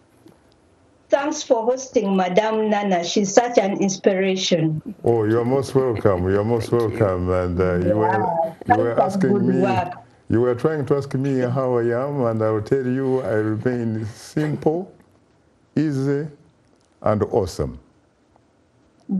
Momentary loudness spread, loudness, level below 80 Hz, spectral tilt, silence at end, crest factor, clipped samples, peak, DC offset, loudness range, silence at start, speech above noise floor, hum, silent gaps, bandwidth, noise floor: 6 LU; -21 LUFS; -50 dBFS; -6 dB/octave; 0 s; 20 dB; under 0.1%; -2 dBFS; under 0.1%; 6 LU; 1.1 s; 38 dB; none; none; 12.5 kHz; -58 dBFS